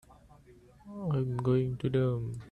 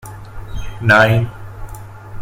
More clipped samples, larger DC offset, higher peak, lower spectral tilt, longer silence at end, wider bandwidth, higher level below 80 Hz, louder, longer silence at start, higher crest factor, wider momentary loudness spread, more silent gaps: neither; neither; second, -16 dBFS vs 0 dBFS; first, -9.5 dB/octave vs -6 dB/octave; about the same, 0 s vs 0 s; second, 9.4 kHz vs 16 kHz; second, -58 dBFS vs -32 dBFS; second, -31 LUFS vs -14 LUFS; about the same, 0.1 s vs 0.05 s; about the same, 16 dB vs 18 dB; second, 9 LU vs 24 LU; neither